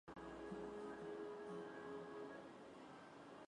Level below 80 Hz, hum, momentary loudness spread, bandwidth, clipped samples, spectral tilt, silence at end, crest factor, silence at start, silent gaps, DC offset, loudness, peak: -76 dBFS; none; 8 LU; 11 kHz; under 0.1%; -6 dB/octave; 0 s; 14 dB; 0.05 s; none; under 0.1%; -53 LUFS; -40 dBFS